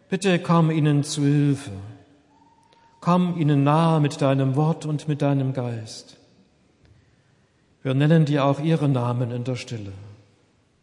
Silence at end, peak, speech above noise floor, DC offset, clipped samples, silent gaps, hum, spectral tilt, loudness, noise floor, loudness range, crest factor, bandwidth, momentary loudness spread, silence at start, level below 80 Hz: 0.7 s; -6 dBFS; 41 dB; under 0.1%; under 0.1%; none; none; -7 dB/octave; -22 LUFS; -61 dBFS; 5 LU; 18 dB; 11.5 kHz; 16 LU; 0.1 s; -70 dBFS